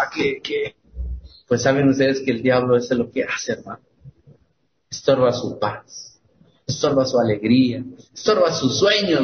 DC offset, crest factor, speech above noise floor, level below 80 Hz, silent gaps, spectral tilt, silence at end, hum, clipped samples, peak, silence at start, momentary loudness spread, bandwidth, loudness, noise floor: under 0.1%; 16 dB; 46 dB; -42 dBFS; none; -5 dB/octave; 0 s; none; under 0.1%; -4 dBFS; 0 s; 18 LU; 6.6 kHz; -20 LUFS; -65 dBFS